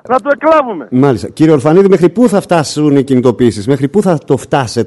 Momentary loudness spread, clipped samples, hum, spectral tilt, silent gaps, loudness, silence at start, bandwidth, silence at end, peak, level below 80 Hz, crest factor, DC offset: 5 LU; 0.8%; none; -6.5 dB/octave; none; -10 LUFS; 0.05 s; 12 kHz; 0 s; 0 dBFS; -46 dBFS; 10 dB; under 0.1%